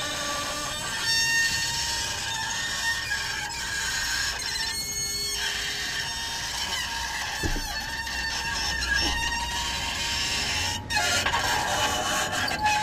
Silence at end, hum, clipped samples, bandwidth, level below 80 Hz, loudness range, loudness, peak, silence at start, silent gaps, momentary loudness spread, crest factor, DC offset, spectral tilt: 0 s; none; under 0.1%; 15.5 kHz; -42 dBFS; 3 LU; -26 LUFS; -12 dBFS; 0 s; none; 6 LU; 16 dB; under 0.1%; -1 dB/octave